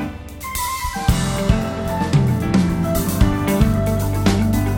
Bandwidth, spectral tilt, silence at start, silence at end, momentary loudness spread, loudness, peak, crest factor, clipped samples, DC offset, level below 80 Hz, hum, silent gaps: 17 kHz; -6 dB/octave; 0 s; 0 s; 6 LU; -19 LUFS; -2 dBFS; 16 dB; under 0.1%; under 0.1%; -26 dBFS; none; none